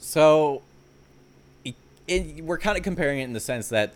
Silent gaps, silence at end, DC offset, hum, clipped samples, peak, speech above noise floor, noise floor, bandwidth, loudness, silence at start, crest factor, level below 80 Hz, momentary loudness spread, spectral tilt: none; 0.05 s; under 0.1%; none; under 0.1%; -6 dBFS; 31 dB; -54 dBFS; 17.5 kHz; -24 LUFS; 0 s; 18 dB; -44 dBFS; 21 LU; -4.5 dB/octave